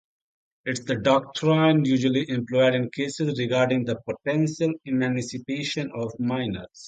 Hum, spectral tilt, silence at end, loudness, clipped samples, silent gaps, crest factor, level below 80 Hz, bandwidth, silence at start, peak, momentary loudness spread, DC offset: none; -6 dB/octave; 0 s; -24 LUFS; under 0.1%; none; 18 dB; -60 dBFS; 9.2 kHz; 0.65 s; -6 dBFS; 9 LU; under 0.1%